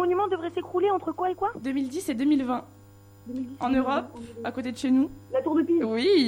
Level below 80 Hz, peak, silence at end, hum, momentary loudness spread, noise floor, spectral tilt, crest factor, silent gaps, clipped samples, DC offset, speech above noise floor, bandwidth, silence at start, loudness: -58 dBFS; -10 dBFS; 0 s; 50 Hz at -50 dBFS; 10 LU; -51 dBFS; -5.5 dB/octave; 16 dB; none; under 0.1%; under 0.1%; 25 dB; 16 kHz; 0 s; -27 LUFS